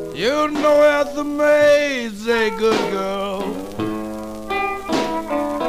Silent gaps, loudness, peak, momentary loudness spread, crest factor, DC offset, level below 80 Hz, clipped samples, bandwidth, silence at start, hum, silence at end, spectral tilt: none; -19 LUFS; -4 dBFS; 12 LU; 14 dB; 0.2%; -46 dBFS; under 0.1%; 15.5 kHz; 0 s; none; 0 s; -4.5 dB/octave